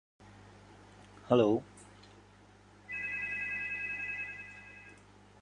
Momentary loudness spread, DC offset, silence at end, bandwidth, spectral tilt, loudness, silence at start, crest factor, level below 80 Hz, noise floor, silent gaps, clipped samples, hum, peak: 28 LU; under 0.1%; 0.45 s; 10.5 kHz; -6.5 dB/octave; -33 LUFS; 0.2 s; 26 dB; -66 dBFS; -59 dBFS; none; under 0.1%; 50 Hz at -60 dBFS; -12 dBFS